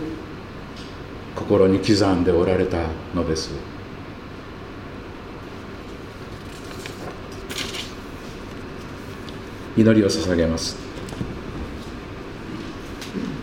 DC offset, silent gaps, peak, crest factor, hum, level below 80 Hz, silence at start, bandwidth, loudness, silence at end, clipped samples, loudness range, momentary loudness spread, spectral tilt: under 0.1%; none; -2 dBFS; 22 dB; none; -42 dBFS; 0 s; 16 kHz; -24 LUFS; 0 s; under 0.1%; 14 LU; 18 LU; -5.5 dB/octave